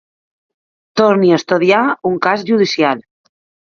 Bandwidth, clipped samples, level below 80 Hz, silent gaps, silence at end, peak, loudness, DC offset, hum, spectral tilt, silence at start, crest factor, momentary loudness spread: 7.2 kHz; under 0.1%; -62 dBFS; none; 0.7 s; 0 dBFS; -14 LUFS; under 0.1%; none; -5.5 dB/octave; 0.95 s; 16 dB; 5 LU